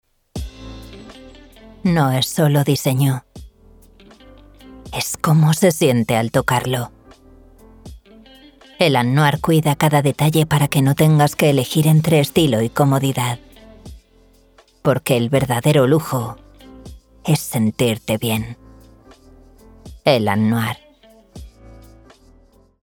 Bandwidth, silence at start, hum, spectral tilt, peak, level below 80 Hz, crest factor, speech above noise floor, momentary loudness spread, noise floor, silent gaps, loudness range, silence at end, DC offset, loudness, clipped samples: 19.5 kHz; 0.35 s; none; -5.5 dB/octave; 0 dBFS; -44 dBFS; 18 dB; 36 dB; 16 LU; -52 dBFS; none; 7 LU; 1.35 s; under 0.1%; -17 LUFS; under 0.1%